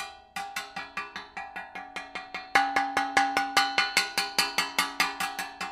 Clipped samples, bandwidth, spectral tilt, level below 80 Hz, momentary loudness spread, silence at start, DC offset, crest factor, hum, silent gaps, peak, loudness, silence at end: under 0.1%; 16 kHz; -0.5 dB/octave; -64 dBFS; 14 LU; 0 s; under 0.1%; 26 dB; none; none; -4 dBFS; -27 LUFS; 0 s